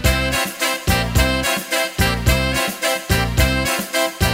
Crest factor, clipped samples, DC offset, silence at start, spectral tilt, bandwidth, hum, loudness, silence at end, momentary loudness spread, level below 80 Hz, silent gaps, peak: 16 dB; under 0.1%; under 0.1%; 0 s; -3.5 dB/octave; 16.5 kHz; none; -18 LUFS; 0 s; 3 LU; -24 dBFS; none; -2 dBFS